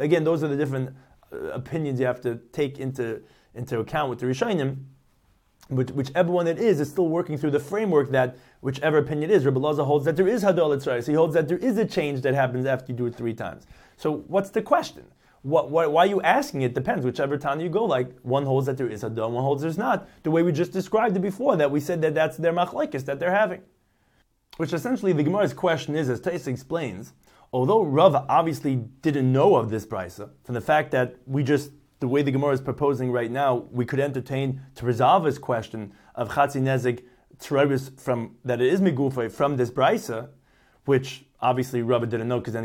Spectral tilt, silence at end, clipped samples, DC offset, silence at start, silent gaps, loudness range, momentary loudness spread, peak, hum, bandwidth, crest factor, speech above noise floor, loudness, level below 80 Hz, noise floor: -7 dB/octave; 0 s; under 0.1%; under 0.1%; 0 s; none; 5 LU; 10 LU; -4 dBFS; none; 16.5 kHz; 20 dB; 42 dB; -24 LUFS; -60 dBFS; -65 dBFS